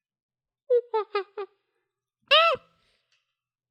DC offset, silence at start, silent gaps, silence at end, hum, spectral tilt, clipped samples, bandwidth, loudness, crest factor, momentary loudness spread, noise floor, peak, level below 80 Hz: under 0.1%; 0.7 s; none; 1.15 s; none; -2 dB/octave; under 0.1%; 13 kHz; -23 LUFS; 20 dB; 20 LU; -84 dBFS; -8 dBFS; -76 dBFS